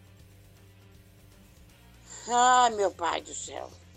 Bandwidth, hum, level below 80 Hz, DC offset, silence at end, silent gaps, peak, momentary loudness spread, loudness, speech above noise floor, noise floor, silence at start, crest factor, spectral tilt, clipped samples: 14.5 kHz; none; -60 dBFS; under 0.1%; 0.2 s; none; -10 dBFS; 21 LU; -26 LUFS; 29 dB; -55 dBFS; 2.1 s; 20 dB; -1.5 dB/octave; under 0.1%